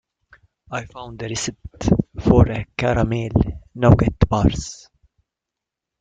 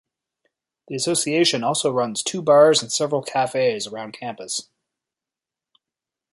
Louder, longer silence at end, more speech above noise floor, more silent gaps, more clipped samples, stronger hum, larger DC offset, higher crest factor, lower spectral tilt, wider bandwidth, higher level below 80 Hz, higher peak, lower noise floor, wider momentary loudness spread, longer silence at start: about the same, -20 LUFS vs -20 LUFS; second, 1.25 s vs 1.7 s; about the same, 67 dB vs 68 dB; neither; neither; neither; neither; about the same, 18 dB vs 20 dB; first, -6.5 dB/octave vs -3 dB/octave; second, 9.2 kHz vs 11.5 kHz; first, -32 dBFS vs -70 dBFS; about the same, -2 dBFS vs -4 dBFS; second, -85 dBFS vs -89 dBFS; about the same, 15 LU vs 16 LU; second, 0.7 s vs 0.9 s